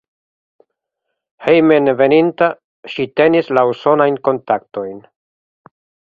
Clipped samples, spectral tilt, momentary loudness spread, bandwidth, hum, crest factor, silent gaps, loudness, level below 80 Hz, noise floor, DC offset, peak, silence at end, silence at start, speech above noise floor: under 0.1%; -8 dB/octave; 14 LU; 5.2 kHz; none; 16 dB; 2.64-2.83 s; -14 LUFS; -60 dBFS; -77 dBFS; under 0.1%; 0 dBFS; 1.15 s; 1.4 s; 63 dB